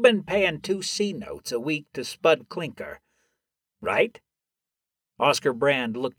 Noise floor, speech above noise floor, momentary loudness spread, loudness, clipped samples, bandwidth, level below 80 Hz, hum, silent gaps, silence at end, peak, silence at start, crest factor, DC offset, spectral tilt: -88 dBFS; 63 dB; 12 LU; -25 LUFS; under 0.1%; 17.5 kHz; -62 dBFS; none; none; 0.1 s; -4 dBFS; 0 s; 22 dB; under 0.1%; -4 dB/octave